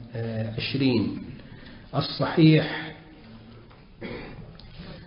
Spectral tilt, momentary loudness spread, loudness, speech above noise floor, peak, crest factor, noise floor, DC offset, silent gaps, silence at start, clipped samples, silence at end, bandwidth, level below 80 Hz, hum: -11 dB/octave; 26 LU; -24 LUFS; 26 dB; -8 dBFS; 20 dB; -48 dBFS; under 0.1%; none; 0 s; under 0.1%; 0 s; 5.4 kHz; -52 dBFS; none